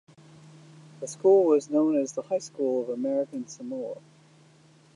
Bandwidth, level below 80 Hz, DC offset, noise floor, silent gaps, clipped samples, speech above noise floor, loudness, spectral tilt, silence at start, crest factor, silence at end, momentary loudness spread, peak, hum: 11 kHz; -84 dBFS; under 0.1%; -57 dBFS; none; under 0.1%; 32 dB; -26 LUFS; -6 dB/octave; 1 s; 18 dB; 1 s; 17 LU; -10 dBFS; none